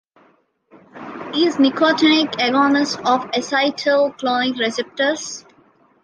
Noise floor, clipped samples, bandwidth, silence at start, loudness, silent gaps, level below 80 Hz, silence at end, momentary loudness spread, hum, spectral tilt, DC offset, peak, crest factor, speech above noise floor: -58 dBFS; under 0.1%; 10 kHz; 0.95 s; -18 LUFS; none; -66 dBFS; 0.65 s; 13 LU; none; -3 dB/octave; under 0.1%; -2 dBFS; 18 dB; 40 dB